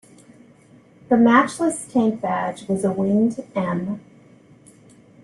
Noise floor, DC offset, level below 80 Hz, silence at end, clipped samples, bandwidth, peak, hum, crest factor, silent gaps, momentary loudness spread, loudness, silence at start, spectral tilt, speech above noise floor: -51 dBFS; under 0.1%; -62 dBFS; 1.25 s; under 0.1%; 12 kHz; -2 dBFS; none; 20 dB; none; 11 LU; -20 LUFS; 1.1 s; -6 dB/octave; 31 dB